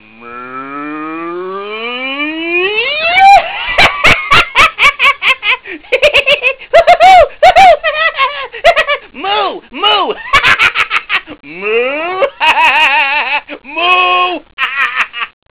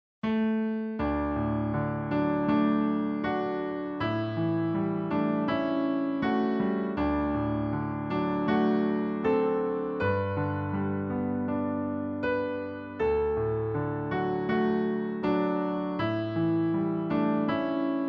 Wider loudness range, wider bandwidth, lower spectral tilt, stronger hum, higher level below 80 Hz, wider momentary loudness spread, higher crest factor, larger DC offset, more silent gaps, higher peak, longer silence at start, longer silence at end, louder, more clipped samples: about the same, 4 LU vs 2 LU; second, 4 kHz vs 5.8 kHz; second, -6 dB/octave vs -10 dB/octave; neither; first, -38 dBFS vs -50 dBFS; first, 16 LU vs 5 LU; about the same, 10 dB vs 14 dB; neither; first, 14.53-14.57 s vs none; first, 0 dBFS vs -14 dBFS; about the same, 0.2 s vs 0.25 s; first, 0.3 s vs 0 s; first, -8 LUFS vs -29 LUFS; first, 2% vs under 0.1%